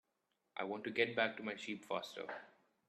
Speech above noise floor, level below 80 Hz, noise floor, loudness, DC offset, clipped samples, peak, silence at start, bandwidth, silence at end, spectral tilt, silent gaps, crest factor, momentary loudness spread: 44 dB; -86 dBFS; -85 dBFS; -41 LUFS; under 0.1%; under 0.1%; -20 dBFS; 0.55 s; 13 kHz; 0.4 s; -4.5 dB/octave; none; 22 dB; 13 LU